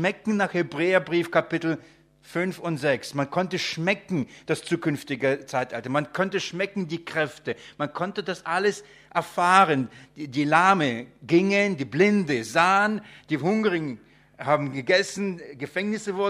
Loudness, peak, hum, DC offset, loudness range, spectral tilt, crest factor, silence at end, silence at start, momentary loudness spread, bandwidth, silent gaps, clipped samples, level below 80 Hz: -25 LUFS; -2 dBFS; none; under 0.1%; 6 LU; -5 dB/octave; 22 dB; 0 s; 0 s; 12 LU; 14.5 kHz; none; under 0.1%; -68 dBFS